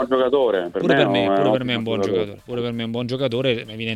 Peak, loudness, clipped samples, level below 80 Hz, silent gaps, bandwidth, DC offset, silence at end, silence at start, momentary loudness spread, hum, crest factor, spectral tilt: -4 dBFS; -21 LUFS; under 0.1%; -54 dBFS; none; 12.5 kHz; under 0.1%; 0 s; 0 s; 8 LU; none; 16 dB; -6.5 dB/octave